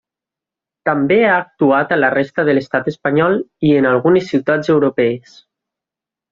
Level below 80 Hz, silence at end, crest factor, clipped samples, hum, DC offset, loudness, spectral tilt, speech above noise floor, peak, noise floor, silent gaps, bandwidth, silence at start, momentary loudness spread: -56 dBFS; 1.15 s; 14 dB; under 0.1%; none; under 0.1%; -15 LUFS; -7.5 dB/octave; 72 dB; 0 dBFS; -87 dBFS; none; 7.2 kHz; 0.85 s; 6 LU